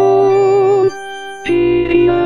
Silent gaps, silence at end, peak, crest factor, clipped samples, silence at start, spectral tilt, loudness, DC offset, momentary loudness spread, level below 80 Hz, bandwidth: none; 0 s; 0 dBFS; 12 dB; under 0.1%; 0 s; -7 dB/octave; -12 LUFS; under 0.1%; 13 LU; -40 dBFS; 10 kHz